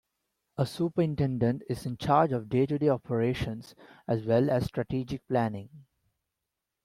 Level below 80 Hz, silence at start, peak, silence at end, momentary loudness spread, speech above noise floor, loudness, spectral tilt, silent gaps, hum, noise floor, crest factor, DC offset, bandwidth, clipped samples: -56 dBFS; 0.6 s; -10 dBFS; 1.05 s; 10 LU; 58 dB; -29 LUFS; -8 dB/octave; none; none; -86 dBFS; 20 dB; under 0.1%; 14.5 kHz; under 0.1%